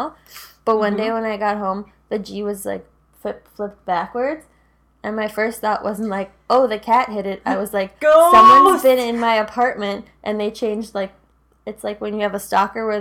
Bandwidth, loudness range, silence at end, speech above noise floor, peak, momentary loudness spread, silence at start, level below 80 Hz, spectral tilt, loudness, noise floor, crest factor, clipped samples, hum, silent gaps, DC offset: 18 kHz; 12 LU; 0 s; 40 dB; 0 dBFS; 17 LU; 0 s; -54 dBFS; -4.5 dB/octave; -18 LUFS; -57 dBFS; 18 dB; under 0.1%; none; none; under 0.1%